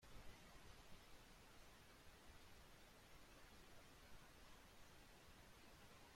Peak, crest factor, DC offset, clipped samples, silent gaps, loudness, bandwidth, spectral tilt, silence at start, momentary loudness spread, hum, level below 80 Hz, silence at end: -46 dBFS; 16 dB; under 0.1%; under 0.1%; none; -66 LUFS; 16.5 kHz; -3.5 dB/octave; 0 s; 2 LU; none; -70 dBFS; 0 s